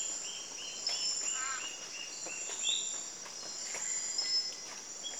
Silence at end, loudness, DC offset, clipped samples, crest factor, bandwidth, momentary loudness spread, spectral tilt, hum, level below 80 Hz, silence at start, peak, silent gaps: 0 s; -35 LUFS; under 0.1%; under 0.1%; 18 dB; over 20 kHz; 9 LU; 2 dB/octave; none; -80 dBFS; 0 s; -20 dBFS; none